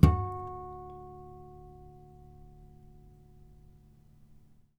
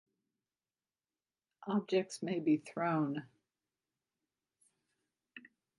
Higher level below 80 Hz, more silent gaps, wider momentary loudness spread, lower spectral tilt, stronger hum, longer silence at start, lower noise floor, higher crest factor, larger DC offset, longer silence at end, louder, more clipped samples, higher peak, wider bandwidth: first, -40 dBFS vs -88 dBFS; neither; about the same, 22 LU vs 22 LU; first, -9 dB/octave vs -6.5 dB/octave; neither; second, 0 s vs 1.6 s; second, -58 dBFS vs under -90 dBFS; first, 30 dB vs 20 dB; neither; first, 3.15 s vs 0.4 s; about the same, -35 LUFS vs -36 LUFS; neither; first, -4 dBFS vs -20 dBFS; first, 15.5 kHz vs 11 kHz